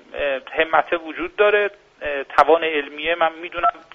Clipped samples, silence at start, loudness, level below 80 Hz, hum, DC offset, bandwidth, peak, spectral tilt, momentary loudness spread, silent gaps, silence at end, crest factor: under 0.1%; 0.1 s; -20 LUFS; -52 dBFS; none; under 0.1%; 7.6 kHz; 0 dBFS; 0 dB/octave; 10 LU; none; 0.15 s; 20 dB